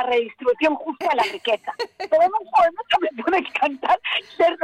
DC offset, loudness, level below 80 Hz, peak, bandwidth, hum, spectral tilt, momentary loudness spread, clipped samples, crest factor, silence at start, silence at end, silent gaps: under 0.1%; -21 LUFS; -62 dBFS; -8 dBFS; 13.5 kHz; none; -3 dB/octave; 6 LU; under 0.1%; 12 dB; 0 s; 0 s; none